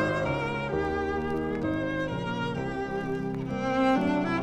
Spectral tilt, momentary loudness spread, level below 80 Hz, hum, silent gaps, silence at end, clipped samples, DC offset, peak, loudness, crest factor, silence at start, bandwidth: -7 dB/octave; 7 LU; -48 dBFS; none; none; 0 s; under 0.1%; under 0.1%; -14 dBFS; -29 LUFS; 14 dB; 0 s; 10.5 kHz